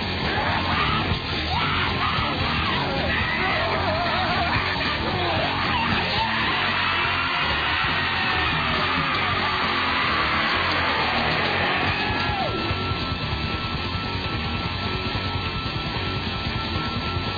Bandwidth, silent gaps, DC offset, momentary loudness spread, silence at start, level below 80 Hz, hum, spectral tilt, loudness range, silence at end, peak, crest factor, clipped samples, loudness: 5 kHz; none; under 0.1%; 5 LU; 0 s; -38 dBFS; none; -6 dB/octave; 5 LU; 0 s; -10 dBFS; 14 dB; under 0.1%; -22 LUFS